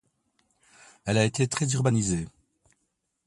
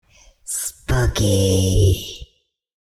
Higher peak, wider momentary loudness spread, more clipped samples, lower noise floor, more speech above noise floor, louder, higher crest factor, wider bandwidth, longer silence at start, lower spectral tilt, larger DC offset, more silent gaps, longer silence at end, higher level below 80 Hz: about the same, -8 dBFS vs -6 dBFS; second, 11 LU vs 16 LU; neither; first, -77 dBFS vs -63 dBFS; first, 53 dB vs 47 dB; second, -26 LUFS vs -19 LUFS; first, 20 dB vs 14 dB; second, 11.5 kHz vs 14.5 kHz; first, 1.05 s vs 0.45 s; about the same, -5 dB/octave vs -5 dB/octave; neither; neither; first, 1 s vs 0.7 s; second, -54 dBFS vs -30 dBFS